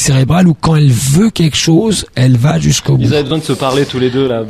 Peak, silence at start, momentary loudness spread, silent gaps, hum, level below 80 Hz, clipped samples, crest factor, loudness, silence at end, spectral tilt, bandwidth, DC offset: 0 dBFS; 0 s; 4 LU; none; none; -34 dBFS; under 0.1%; 10 dB; -11 LUFS; 0 s; -5.5 dB/octave; 15 kHz; under 0.1%